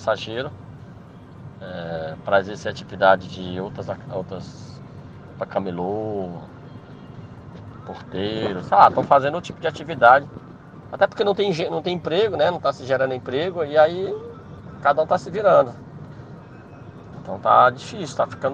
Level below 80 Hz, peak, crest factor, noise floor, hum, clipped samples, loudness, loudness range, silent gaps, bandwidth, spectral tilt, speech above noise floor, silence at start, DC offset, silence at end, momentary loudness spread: -56 dBFS; 0 dBFS; 22 dB; -42 dBFS; none; under 0.1%; -21 LUFS; 11 LU; none; 9 kHz; -6 dB/octave; 21 dB; 0 s; under 0.1%; 0 s; 25 LU